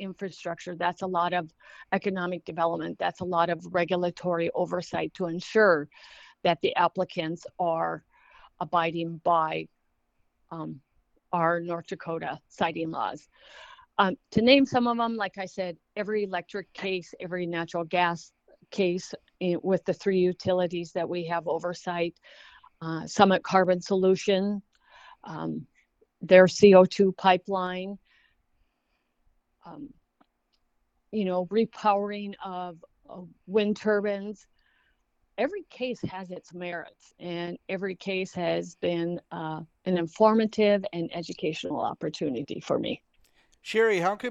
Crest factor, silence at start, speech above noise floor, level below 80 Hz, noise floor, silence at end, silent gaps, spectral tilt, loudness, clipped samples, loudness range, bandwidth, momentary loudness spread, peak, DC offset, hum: 26 dB; 0 s; 48 dB; -66 dBFS; -75 dBFS; 0 s; none; -5.5 dB/octave; -27 LUFS; under 0.1%; 10 LU; 8.4 kHz; 17 LU; -2 dBFS; under 0.1%; none